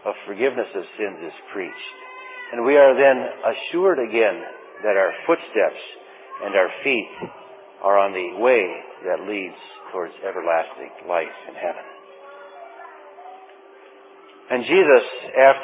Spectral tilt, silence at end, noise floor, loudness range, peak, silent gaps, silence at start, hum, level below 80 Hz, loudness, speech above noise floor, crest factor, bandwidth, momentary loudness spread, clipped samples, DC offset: -8 dB/octave; 0 s; -46 dBFS; 10 LU; -2 dBFS; none; 0.05 s; none; -80 dBFS; -20 LUFS; 26 dB; 20 dB; 4 kHz; 24 LU; under 0.1%; under 0.1%